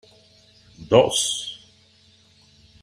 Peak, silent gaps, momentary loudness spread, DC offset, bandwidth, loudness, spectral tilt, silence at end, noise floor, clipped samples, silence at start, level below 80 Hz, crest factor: -2 dBFS; none; 19 LU; under 0.1%; 15.5 kHz; -20 LUFS; -3 dB/octave; 1.25 s; -56 dBFS; under 0.1%; 0.8 s; -58 dBFS; 24 dB